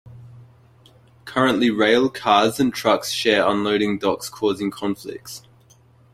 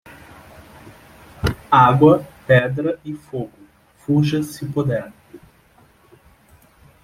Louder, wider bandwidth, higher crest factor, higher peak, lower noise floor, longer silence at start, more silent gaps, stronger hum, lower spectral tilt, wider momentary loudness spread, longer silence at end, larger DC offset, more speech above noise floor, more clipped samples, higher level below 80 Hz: about the same, -20 LUFS vs -18 LUFS; about the same, 16 kHz vs 15.5 kHz; about the same, 20 dB vs 20 dB; about the same, -2 dBFS vs -2 dBFS; about the same, -53 dBFS vs -53 dBFS; second, 0.05 s vs 0.85 s; neither; neither; second, -4 dB/octave vs -7.5 dB/octave; second, 13 LU vs 17 LU; second, 0.75 s vs 1.65 s; neither; second, 33 dB vs 37 dB; neither; second, -58 dBFS vs -44 dBFS